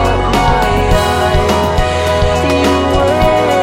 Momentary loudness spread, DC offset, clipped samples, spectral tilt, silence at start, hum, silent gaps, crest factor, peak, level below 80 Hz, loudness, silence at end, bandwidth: 2 LU; under 0.1%; under 0.1%; -5.5 dB/octave; 0 s; none; none; 12 dB; 0 dBFS; -20 dBFS; -12 LUFS; 0 s; 16.5 kHz